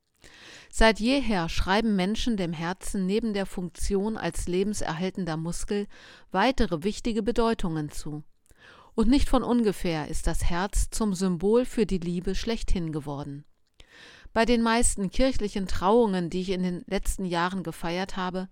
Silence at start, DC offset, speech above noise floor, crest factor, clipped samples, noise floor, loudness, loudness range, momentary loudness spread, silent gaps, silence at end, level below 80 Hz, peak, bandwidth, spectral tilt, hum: 0.25 s; under 0.1%; 29 dB; 20 dB; under 0.1%; -54 dBFS; -27 LUFS; 3 LU; 10 LU; none; 0.05 s; -34 dBFS; -6 dBFS; 16 kHz; -5 dB/octave; none